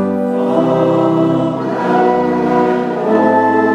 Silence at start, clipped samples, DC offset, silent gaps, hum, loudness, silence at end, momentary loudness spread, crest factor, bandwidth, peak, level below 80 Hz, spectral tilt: 0 s; under 0.1%; under 0.1%; none; none; -13 LUFS; 0 s; 4 LU; 12 dB; 9.2 kHz; 0 dBFS; -52 dBFS; -8 dB/octave